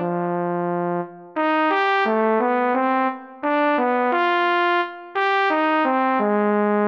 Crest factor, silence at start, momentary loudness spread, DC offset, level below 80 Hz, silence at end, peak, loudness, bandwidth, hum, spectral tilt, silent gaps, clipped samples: 14 dB; 0 s; 6 LU; under 0.1%; -76 dBFS; 0 s; -6 dBFS; -20 LUFS; 7 kHz; none; -7.5 dB/octave; none; under 0.1%